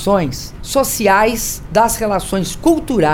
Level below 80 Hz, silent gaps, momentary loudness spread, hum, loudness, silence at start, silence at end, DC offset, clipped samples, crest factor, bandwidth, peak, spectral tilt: -32 dBFS; none; 8 LU; none; -15 LUFS; 0 s; 0 s; under 0.1%; under 0.1%; 14 dB; over 20 kHz; 0 dBFS; -4 dB/octave